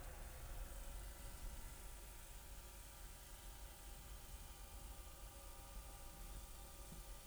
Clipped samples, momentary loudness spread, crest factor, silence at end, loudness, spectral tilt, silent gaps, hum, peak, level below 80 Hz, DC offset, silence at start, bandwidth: under 0.1%; 2 LU; 14 dB; 0 s; -56 LUFS; -3 dB/octave; none; none; -38 dBFS; -56 dBFS; under 0.1%; 0 s; over 20 kHz